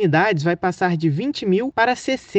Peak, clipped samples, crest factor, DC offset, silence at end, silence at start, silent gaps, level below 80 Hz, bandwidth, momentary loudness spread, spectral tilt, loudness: -4 dBFS; under 0.1%; 14 dB; under 0.1%; 0 s; 0 s; none; -58 dBFS; 8.8 kHz; 4 LU; -6.5 dB/octave; -20 LUFS